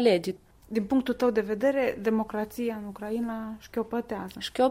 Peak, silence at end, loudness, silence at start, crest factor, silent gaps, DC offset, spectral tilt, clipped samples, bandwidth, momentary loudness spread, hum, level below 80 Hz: -10 dBFS; 0 s; -29 LUFS; 0 s; 18 dB; none; under 0.1%; -5.5 dB/octave; under 0.1%; 16 kHz; 10 LU; none; -58 dBFS